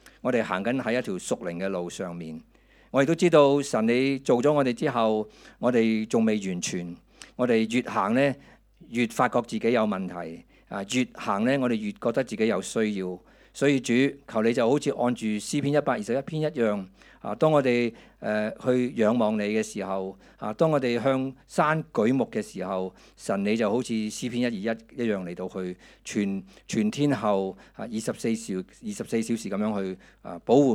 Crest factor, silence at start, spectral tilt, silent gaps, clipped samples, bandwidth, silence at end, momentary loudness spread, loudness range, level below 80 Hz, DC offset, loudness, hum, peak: 20 dB; 0.25 s; -5.5 dB/octave; none; under 0.1%; 14.5 kHz; 0 s; 13 LU; 5 LU; -62 dBFS; under 0.1%; -26 LUFS; none; -6 dBFS